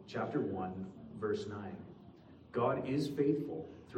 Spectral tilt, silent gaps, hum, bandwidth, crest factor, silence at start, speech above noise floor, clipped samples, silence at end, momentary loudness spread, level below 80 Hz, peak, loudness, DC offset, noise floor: -7.5 dB/octave; none; none; 14 kHz; 18 dB; 0 s; 20 dB; under 0.1%; 0 s; 16 LU; -70 dBFS; -20 dBFS; -38 LUFS; under 0.1%; -57 dBFS